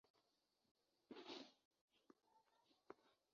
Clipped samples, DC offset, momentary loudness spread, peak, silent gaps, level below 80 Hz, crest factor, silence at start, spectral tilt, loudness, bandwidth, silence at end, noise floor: under 0.1%; under 0.1%; 10 LU; -40 dBFS; 0.10-0.14 s, 0.71-0.75 s, 1.65-1.71 s, 1.81-1.88 s; under -90 dBFS; 28 dB; 0.05 s; -1 dB/octave; -61 LUFS; 7 kHz; 0.2 s; -88 dBFS